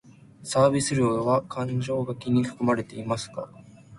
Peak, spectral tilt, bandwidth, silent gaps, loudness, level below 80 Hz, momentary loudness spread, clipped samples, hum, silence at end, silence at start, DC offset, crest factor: -8 dBFS; -6 dB/octave; 11.5 kHz; none; -25 LUFS; -58 dBFS; 13 LU; under 0.1%; none; 0 s; 0.4 s; under 0.1%; 18 dB